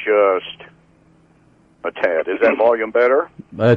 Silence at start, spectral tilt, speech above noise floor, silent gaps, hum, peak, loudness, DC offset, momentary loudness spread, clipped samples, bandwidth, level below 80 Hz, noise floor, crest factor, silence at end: 0 s; -8 dB/octave; 37 dB; none; none; -4 dBFS; -17 LUFS; under 0.1%; 15 LU; under 0.1%; 6 kHz; -60 dBFS; -53 dBFS; 14 dB; 0 s